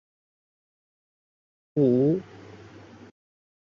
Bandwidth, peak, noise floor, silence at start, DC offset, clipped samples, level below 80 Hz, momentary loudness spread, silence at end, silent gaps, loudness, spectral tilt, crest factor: 6.8 kHz; -10 dBFS; -48 dBFS; 1.75 s; under 0.1%; under 0.1%; -70 dBFS; 25 LU; 1.15 s; none; -24 LUFS; -10.5 dB/octave; 20 dB